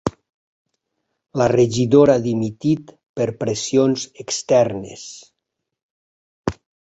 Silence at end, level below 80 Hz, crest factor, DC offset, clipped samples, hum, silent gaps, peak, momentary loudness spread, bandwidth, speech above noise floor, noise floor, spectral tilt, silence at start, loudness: 0.35 s; -50 dBFS; 18 dB; under 0.1%; under 0.1%; none; 0.34-0.65 s, 3.09-3.14 s, 5.83-6.44 s; -2 dBFS; 16 LU; 8.2 kHz; 62 dB; -80 dBFS; -5.5 dB/octave; 0.05 s; -19 LUFS